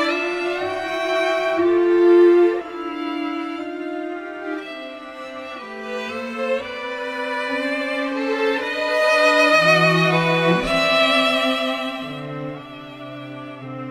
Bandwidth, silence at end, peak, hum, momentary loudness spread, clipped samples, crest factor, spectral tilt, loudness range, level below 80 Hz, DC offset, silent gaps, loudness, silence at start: 13.5 kHz; 0 s; -2 dBFS; none; 19 LU; under 0.1%; 18 dB; -5 dB/octave; 12 LU; -54 dBFS; under 0.1%; none; -19 LUFS; 0 s